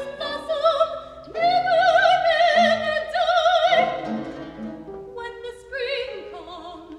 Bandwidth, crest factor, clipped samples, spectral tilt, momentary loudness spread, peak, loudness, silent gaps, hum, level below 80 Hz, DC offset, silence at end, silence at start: 10.5 kHz; 16 dB; under 0.1%; -3.5 dB/octave; 19 LU; -6 dBFS; -20 LUFS; none; none; -56 dBFS; under 0.1%; 0 s; 0 s